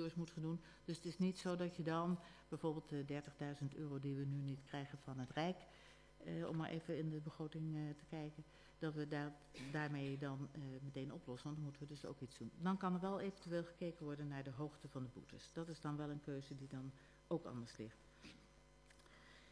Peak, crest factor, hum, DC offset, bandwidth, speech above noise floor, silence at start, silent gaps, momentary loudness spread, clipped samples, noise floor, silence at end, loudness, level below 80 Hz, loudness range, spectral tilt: -28 dBFS; 18 dB; none; under 0.1%; 11 kHz; 21 dB; 0 s; none; 13 LU; under 0.1%; -67 dBFS; 0 s; -47 LUFS; -72 dBFS; 5 LU; -7 dB/octave